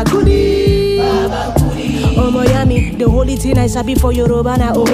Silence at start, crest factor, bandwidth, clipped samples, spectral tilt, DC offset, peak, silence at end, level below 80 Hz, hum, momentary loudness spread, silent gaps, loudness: 0 s; 12 dB; 15.5 kHz; under 0.1%; -6.5 dB/octave; under 0.1%; 0 dBFS; 0 s; -18 dBFS; none; 4 LU; none; -13 LUFS